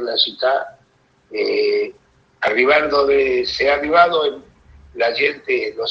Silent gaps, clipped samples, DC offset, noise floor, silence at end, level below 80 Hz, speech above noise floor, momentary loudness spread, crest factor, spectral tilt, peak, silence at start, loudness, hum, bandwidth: none; under 0.1%; under 0.1%; -58 dBFS; 0 s; -52 dBFS; 40 dB; 10 LU; 18 dB; -3.5 dB/octave; 0 dBFS; 0 s; -17 LUFS; none; 7 kHz